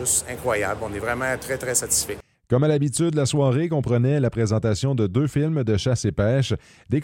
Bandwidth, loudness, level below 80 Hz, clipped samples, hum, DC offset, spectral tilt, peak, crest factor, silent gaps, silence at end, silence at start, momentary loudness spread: 17 kHz; -22 LUFS; -46 dBFS; under 0.1%; none; under 0.1%; -5 dB/octave; -6 dBFS; 16 dB; none; 0 s; 0 s; 7 LU